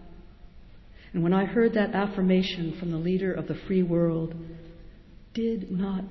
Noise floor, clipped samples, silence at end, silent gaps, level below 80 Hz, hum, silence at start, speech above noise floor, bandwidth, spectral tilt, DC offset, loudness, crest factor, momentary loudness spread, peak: -48 dBFS; under 0.1%; 0 s; none; -50 dBFS; none; 0 s; 22 dB; 6 kHz; -8.5 dB/octave; under 0.1%; -27 LUFS; 16 dB; 12 LU; -10 dBFS